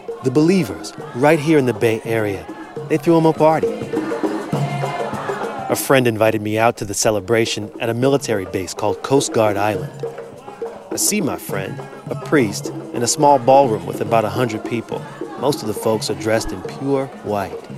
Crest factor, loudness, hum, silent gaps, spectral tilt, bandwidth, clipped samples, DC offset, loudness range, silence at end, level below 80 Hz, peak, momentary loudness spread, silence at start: 18 dB; -18 LUFS; none; none; -5 dB/octave; 16 kHz; under 0.1%; under 0.1%; 4 LU; 0 s; -50 dBFS; 0 dBFS; 14 LU; 0 s